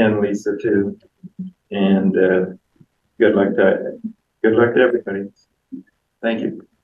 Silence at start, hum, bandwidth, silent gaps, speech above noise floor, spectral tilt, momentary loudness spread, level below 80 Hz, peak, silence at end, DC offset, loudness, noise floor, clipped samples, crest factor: 0 s; none; 7.6 kHz; none; 39 dB; -7.5 dB/octave; 20 LU; -62 dBFS; 0 dBFS; 0.2 s; under 0.1%; -18 LUFS; -56 dBFS; under 0.1%; 18 dB